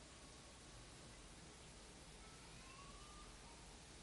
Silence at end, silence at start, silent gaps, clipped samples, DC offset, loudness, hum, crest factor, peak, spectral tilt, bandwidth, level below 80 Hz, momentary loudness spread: 0 s; 0 s; none; under 0.1%; under 0.1%; -59 LUFS; none; 14 dB; -44 dBFS; -3 dB/octave; 11.5 kHz; -66 dBFS; 2 LU